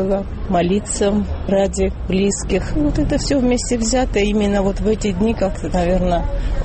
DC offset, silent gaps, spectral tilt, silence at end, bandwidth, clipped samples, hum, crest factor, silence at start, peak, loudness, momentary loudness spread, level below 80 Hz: under 0.1%; none; -5.5 dB/octave; 0 s; 8.8 kHz; under 0.1%; none; 12 dB; 0 s; -6 dBFS; -18 LUFS; 4 LU; -24 dBFS